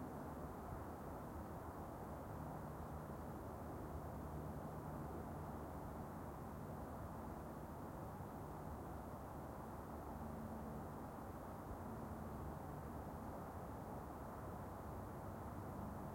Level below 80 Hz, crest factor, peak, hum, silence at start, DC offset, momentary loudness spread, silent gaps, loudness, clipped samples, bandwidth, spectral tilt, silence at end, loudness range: -60 dBFS; 14 dB; -36 dBFS; none; 0 s; under 0.1%; 2 LU; none; -51 LUFS; under 0.1%; 16.5 kHz; -7.5 dB/octave; 0 s; 1 LU